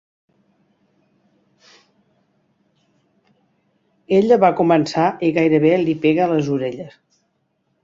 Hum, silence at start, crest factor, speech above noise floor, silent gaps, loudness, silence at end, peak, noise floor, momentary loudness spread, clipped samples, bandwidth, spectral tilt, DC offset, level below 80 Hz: none; 4.1 s; 18 dB; 52 dB; none; -17 LUFS; 0.95 s; -2 dBFS; -68 dBFS; 9 LU; under 0.1%; 7.6 kHz; -7 dB/octave; under 0.1%; -62 dBFS